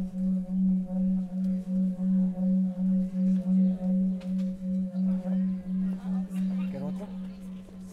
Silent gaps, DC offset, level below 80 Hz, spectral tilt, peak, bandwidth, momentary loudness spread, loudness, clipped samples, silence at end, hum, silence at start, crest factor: none; under 0.1%; -52 dBFS; -10.5 dB/octave; -18 dBFS; 3.2 kHz; 9 LU; -29 LUFS; under 0.1%; 0 s; none; 0 s; 10 dB